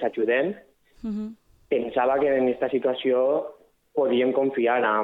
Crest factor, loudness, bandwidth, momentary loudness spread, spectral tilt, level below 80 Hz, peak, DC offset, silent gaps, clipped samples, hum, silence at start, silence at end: 14 dB; -24 LUFS; 4.7 kHz; 12 LU; -7.5 dB/octave; -62 dBFS; -10 dBFS; under 0.1%; none; under 0.1%; none; 0 s; 0 s